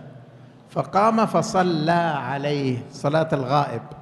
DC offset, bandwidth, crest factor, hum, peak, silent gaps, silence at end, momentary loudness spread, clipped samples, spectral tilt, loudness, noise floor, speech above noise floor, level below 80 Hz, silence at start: under 0.1%; 12 kHz; 16 dB; none; -6 dBFS; none; 0 s; 8 LU; under 0.1%; -6 dB/octave; -22 LUFS; -46 dBFS; 25 dB; -60 dBFS; 0 s